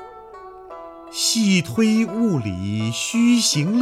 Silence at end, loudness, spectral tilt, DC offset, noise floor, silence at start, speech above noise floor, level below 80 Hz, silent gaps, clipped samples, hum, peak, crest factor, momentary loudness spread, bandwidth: 0 s; -19 LUFS; -4 dB/octave; under 0.1%; -40 dBFS; 0 s; 21 dB; -58 dBFS; none; under 0.1%; none; -6 dBFS; 14 dB; 23 LU; 15 kHz